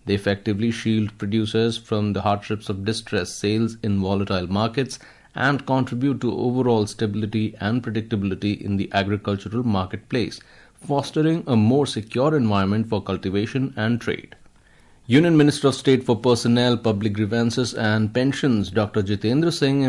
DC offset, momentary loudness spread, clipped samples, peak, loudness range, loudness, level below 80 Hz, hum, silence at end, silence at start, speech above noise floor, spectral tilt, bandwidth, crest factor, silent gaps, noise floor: under 0.1%; 7 LU; under 0.1%; -6 dBFS; 5 LU; -22 LUFS; -56 dBFS; none; 0 s; 0.05 s; 31 dB; -6.5 dB/octave; 11.5 kHz; 16 dB; none; -53 dBFS